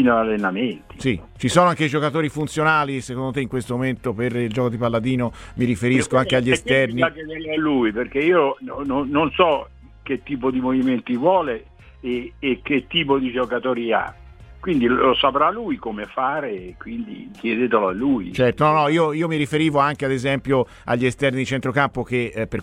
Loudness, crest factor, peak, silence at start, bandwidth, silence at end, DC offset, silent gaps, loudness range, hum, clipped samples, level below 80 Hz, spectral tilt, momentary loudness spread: -21 LUFS; 20 dB; 0 dBFS; 0 s; 12 kHz; 0 s; under 0.1%; none; 3 LU; none; under 0.1%; -46 dBFS; -6 dB/octave; 10 LU